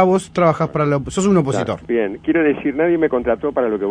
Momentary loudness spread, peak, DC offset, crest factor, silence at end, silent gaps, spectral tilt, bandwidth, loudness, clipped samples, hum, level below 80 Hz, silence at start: 4 LU; 0 dBFS; under 0.1%; 16 dB; 0 s; none; -6.5 dB/octave; 10.5 kHz; -18 LUFS; under 0.1%; none; -44 dBFS; 0 s